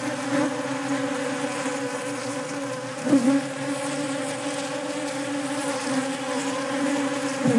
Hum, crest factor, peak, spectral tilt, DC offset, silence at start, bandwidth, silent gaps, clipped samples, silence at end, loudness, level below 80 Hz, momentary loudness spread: none; 18 dB; -8 dBFS; -4 dB/octave; under 0.1%; 0 s; 11.5 kHz; none; under 0.1%; 0 s; -26 LUFS; -80 dBFS; 6 LU